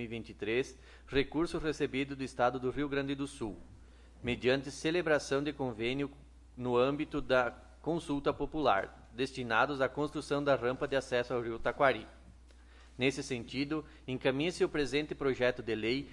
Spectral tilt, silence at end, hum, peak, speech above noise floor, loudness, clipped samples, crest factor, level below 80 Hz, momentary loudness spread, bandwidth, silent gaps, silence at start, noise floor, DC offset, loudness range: -5.5 dB/octave; 0 s; none; -14 dBFS; 23 dB; -34 LUFS; under 0.1%; 20 dB; -54 dBFS; 9 LU; 11.5 kHz; none; 0 s; -56 dBFS; under 0.1%; 3 LU